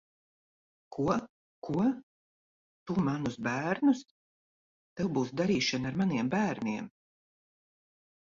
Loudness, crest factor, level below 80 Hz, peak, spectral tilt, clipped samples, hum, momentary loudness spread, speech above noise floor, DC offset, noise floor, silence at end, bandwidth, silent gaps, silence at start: -31 LUFS; 18 dB; -64 dBFS; -14 dBFS; -6 dB/octave; under 0.1%; none; 14 LU; over 60 dB; under 0.1%; under -90 dBFS; 1.4 s; 7.6 kHz; 1.29-1.62 s, 2.03-2.86 s, 4.11-4.96 s; 0.9 s